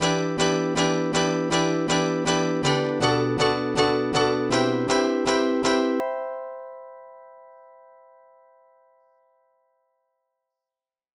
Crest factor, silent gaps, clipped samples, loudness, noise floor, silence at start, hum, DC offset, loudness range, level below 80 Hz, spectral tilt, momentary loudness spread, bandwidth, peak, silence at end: 18 dB; none; under 0.1%; -23 LUFS; under -90 dBFS; 0 s; none; under 0.1%; 10 LU; -54 dBFS; -4.5 dB/octave; 10 LU; 12 kHz; -8 dBFS; 3.8 s